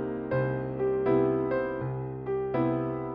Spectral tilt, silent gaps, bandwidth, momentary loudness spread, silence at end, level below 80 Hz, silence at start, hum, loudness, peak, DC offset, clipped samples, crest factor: -8.5 dB/octave; none; 5.2 kHz; 8 LU; 0 s; -54 dBFS; 0 s; none; -29 LUFS; -14 dBFS; under 0.1%; under 0.1%; 16 dB